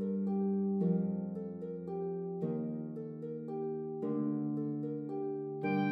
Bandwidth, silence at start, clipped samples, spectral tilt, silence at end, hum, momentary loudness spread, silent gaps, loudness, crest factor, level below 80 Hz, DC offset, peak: 5 kHz; 0 s; under 0.1%; -11 dB/octave; 0 s; none; 9 LU; none; -37 LUFS; 14 dB; -80 dBFS; under 0.1%; -22 dBFS